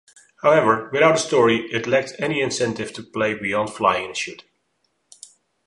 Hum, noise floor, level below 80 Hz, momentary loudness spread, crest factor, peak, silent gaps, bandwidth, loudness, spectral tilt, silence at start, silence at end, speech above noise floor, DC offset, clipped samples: none; -70 dBFS; -60 dBFS; 10 LU; 18 dB; -2 dBFS; none; 11.5 kHz; -20 LUFS; -4 dB/octave; 0.45 s; 1.3 s; 50 dB; under 0.1%; under 0.1%